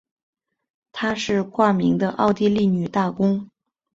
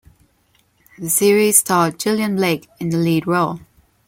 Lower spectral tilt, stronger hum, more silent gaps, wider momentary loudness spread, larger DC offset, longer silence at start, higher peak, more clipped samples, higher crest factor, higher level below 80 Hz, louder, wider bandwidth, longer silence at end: first, -6.5 dB/octave vs -4 dB/octave; neither; neither; second, 7 LU vs 11 LU; neither; about the same, 0.95 s vs 1 s; second, -4 dBFS vs 0 dBFS; neither; about the same, 18 dB vs 18 dB; about the same, -56 dBFS vs -58 dBFS; second, -21 LUFS vs -17 LUFS; second, 7.8 kHz vs 17 kHz; about the same, 0.5 s vs 0.5 s